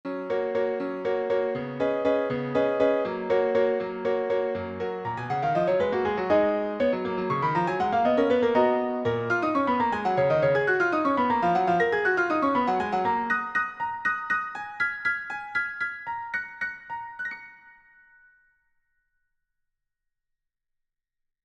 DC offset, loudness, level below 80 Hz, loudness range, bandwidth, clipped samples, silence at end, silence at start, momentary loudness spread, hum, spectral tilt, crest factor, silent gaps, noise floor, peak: under 0.1%; -26 LUFS; -64 dBFS; 10 LU; 8.2 kHz; under 0.1%; 3.75 s; 0.05 s; 9 LU; none; -7 dB/octave; 16 dB; none; -83 dBFS; -10 dBFS